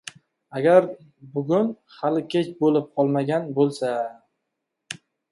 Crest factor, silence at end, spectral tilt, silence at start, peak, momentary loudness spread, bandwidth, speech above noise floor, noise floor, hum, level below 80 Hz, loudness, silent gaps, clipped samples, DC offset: 20 dB; 0.4 s; -7 dB/octave; 0.5 s; -4 dBFS; 20 LU; 11.5 kHz; 58 dB; -80 dBFS; none; -72 dBFS; -23 LUFS; none; under 0.1%; under 0.1%